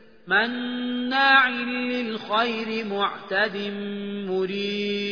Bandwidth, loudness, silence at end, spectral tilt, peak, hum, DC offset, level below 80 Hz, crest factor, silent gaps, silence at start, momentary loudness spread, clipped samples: 5.4 kHz; -24 LUFS; 0 s; -5.5 dB/octave; -6 dBFS; none; 0.2%; -72 dBFS; 20 dB; none; 0.25 s; 12 LU; under 0.1%